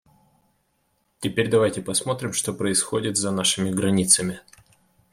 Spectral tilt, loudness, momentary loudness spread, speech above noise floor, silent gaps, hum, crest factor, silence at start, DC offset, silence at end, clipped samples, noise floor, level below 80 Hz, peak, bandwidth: -3.5 dB/octave; -22 LUFS; 9 LU; 47 dB; none; none; 22 dB; 1.2 s; under 0.1%; 0.7 s; under 0.1%; -69 dBFS; -60 dBFS; -2 dBFS; 16 kHz